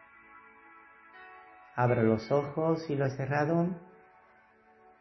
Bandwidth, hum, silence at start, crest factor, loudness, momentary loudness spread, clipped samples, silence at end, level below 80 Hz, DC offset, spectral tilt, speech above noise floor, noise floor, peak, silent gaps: 6.2 kHz; none; 0.35 s; 20 dB; -30 LUFS; 24 LU; under 0.1%; 1.15 s; -66 dBFS; under 0.1%; -8.5 dB/octave; 33 dB; -62 dBFS; -12 dBFS; none